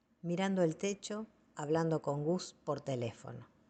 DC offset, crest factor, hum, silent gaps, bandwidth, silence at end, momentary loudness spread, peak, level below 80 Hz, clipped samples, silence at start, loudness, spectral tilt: under 0.1%; 16 dB; none; none; 9 kHz; 0.25 s; 12 LU; -20 dBFS; -74 dBFS; under 0.1%; 0.25 s; -37 LUFS; -6 dB/octave